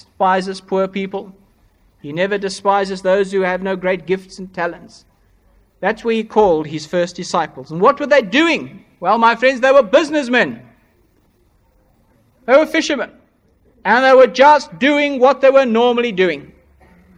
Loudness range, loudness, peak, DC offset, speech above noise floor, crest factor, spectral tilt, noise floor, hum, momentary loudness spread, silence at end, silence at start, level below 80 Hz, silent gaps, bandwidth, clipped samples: 7 LU; -15 LUFS; 0 dBFS; under 0.1%; 42 dB; 16 dB; -4.5 dB/octave; -56 dBFS; none; 13 LU; 0.7 s; 0.2 s; -54 dBFS; none; 10.5 kHz; under 0.1%